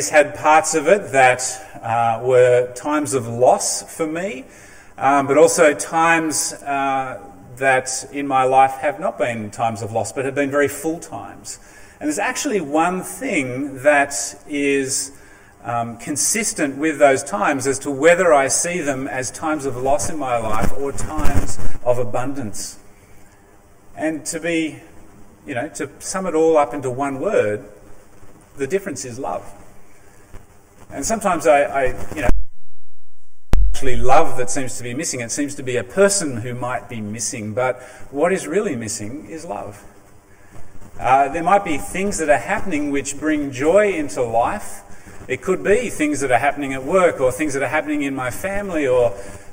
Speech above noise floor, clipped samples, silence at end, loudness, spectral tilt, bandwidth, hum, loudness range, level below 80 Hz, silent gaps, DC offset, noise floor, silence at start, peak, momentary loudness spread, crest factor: 31 dB; under 0.1%; 0 s; -19 LUFS; -4 dB/octave; 16 kHz; none; 8 LU; -34 dBFS; none; under 0.1%; -48 dBFS; 0 s; 0 dBFS; 13 LU; 18 dB